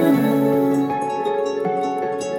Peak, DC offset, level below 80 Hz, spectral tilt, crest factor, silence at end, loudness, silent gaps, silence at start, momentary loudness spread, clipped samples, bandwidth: -4 dBFS; under 0.1%; -60 dBFS; -7 dB/octave; 14 dB; 0 s; -20 LUFS; none; 0 s; 5 LU; under 0.1%; 17 kHz